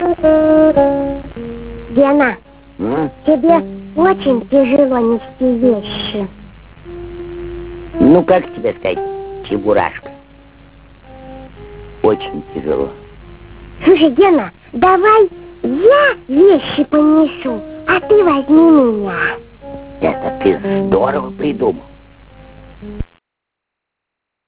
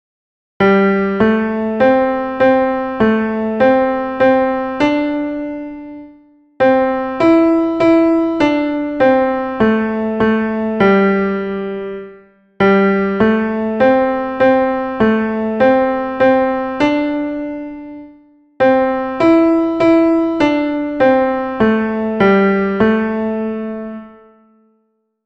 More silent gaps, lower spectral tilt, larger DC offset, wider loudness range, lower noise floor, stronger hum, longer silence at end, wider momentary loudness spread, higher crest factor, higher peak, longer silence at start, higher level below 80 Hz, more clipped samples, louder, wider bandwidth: neither; first, -10 dB/octave vs -8 dB/octave; first, 0.1% vs under 0.1%; first, 10 LU vs 3 LU; first, -79 dBFS vs -64 dBFS; neither; first, 1.45 s vs 1.15 s; first, 19 LU vs 10 LU; about the same, 14 dB vs 14 dB; about the same, 0 dBFS vs 0 dBFS; second, 0 s vs 0.6 s; first, -38 dBFS vs -46 dBFS; neither; about the same, -13 LUFS vs -14 LUFS; second, 4 kHz vs 8 kHz